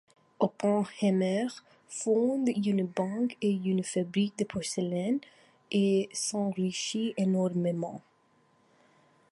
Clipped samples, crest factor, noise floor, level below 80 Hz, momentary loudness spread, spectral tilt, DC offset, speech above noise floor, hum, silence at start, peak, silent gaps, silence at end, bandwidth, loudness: under 0.1%; 18 dB; -67 dBFS; -72 dBFS; 7 LU; -5.5 dB/octave; under 0.1%; 38 dB; none; 0.4 s; -12 dBFS; none; 1.3 s; 11.5 kHz; -30 LUFS